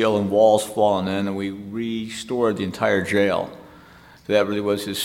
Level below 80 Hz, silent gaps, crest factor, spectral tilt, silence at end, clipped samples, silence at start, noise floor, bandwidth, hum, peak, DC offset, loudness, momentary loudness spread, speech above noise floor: -58 dBFS; none; 18 dB; -5 dB/octave; 0 s; under 0.1%; 0 s; -48 dBFS; 16.5 kHz; none; -4 dBFS; under 0.1%; -21 LUFS; 12 LU; 27 dB